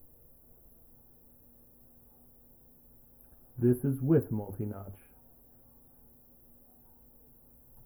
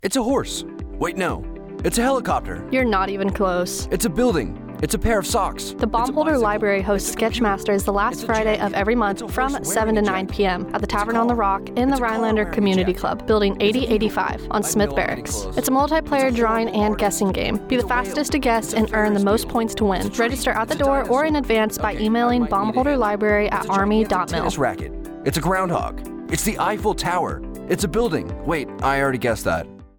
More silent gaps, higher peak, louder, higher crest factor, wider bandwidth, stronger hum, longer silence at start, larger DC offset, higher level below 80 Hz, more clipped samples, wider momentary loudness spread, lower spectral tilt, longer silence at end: neither; second, -14 dBFS vs -6 dBFS; second, -31 LUFS vs -21 LUFS; first, 22 dB vs 14 dB; about the same, over 20 kHz vs 19.5 kHz; neither; about the same, 0.05 s vs 0.05 s; neither; second, -64 dBFS vs -34 dBFS; neither; first, 29 LU vs 6 LU; first, -10.5 dB/octave vs -4.5 dB/octave; first, 2.9 s vs 0.1 s